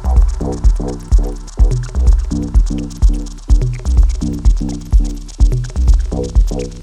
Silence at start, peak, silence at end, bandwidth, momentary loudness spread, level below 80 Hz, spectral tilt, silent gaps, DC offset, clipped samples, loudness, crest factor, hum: 0 s; 0 dBFS; 0 s; 9 kHz; 4 LU; -12 dBFS; -7.5 dB/octave; none; under 0.1%; under 0.1%; -17 LUFS; 12 dB; none